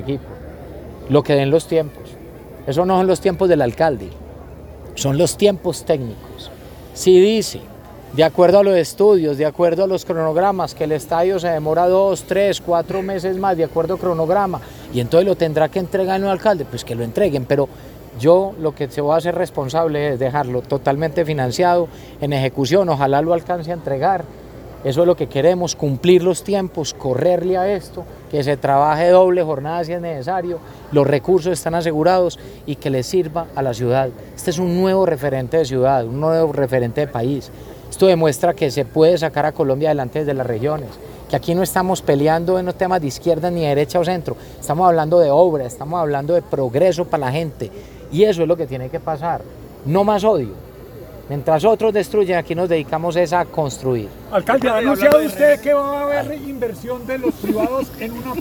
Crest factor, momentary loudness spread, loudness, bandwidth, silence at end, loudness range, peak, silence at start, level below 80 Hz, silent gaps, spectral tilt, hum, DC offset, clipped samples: 18 dB; 14 LU; -17 LUFS; over 20 kHz; 0 s; 3 LU; 0 dBFS; 0 s; -44 dBFS; none; -6 dB/octave; none; under 0.1%; under 0.1%